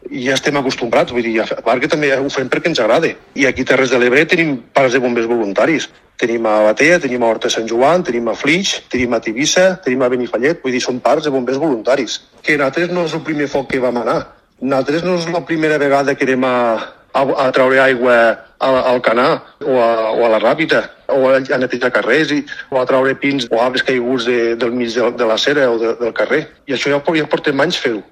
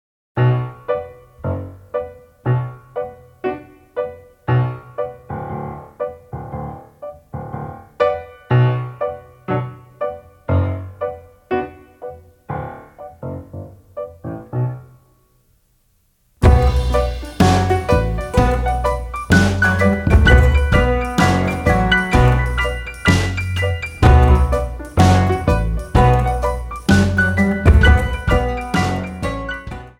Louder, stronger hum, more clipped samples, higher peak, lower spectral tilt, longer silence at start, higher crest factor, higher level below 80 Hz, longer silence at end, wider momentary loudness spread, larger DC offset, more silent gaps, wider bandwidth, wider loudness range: first, -15 LUFS vs -18 LUFS; neither; neither; about the same, 0 dBFS vs 0 dBFS; second, -4 dB/octave vs -6.5 dB/octave; second, 0.05 s vs 0.35 s; about the same, 14 dB vs 18 dB; second, -52 dBFS vs -22 dBFS; about the same, 0.1 s vs 0.1 s; second, 7 LU vs 19 LU; neither; neither; second, 13 kHz vs 15.5 kHz; second, 3 LU vs 14 LU